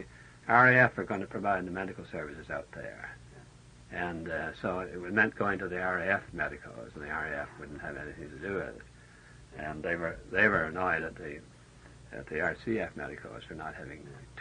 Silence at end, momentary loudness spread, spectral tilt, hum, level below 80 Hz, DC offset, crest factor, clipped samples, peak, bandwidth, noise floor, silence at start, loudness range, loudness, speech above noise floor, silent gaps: 0 s; 19 LU; -6.5 dB/octave; none; -58 dBFS; under 0.1%; 24 dB; under 0.1%; -8 dBFS; 10 kHz; -54 dBFS; 0 s; 10 LU; -31 LUFS; 22 dB; none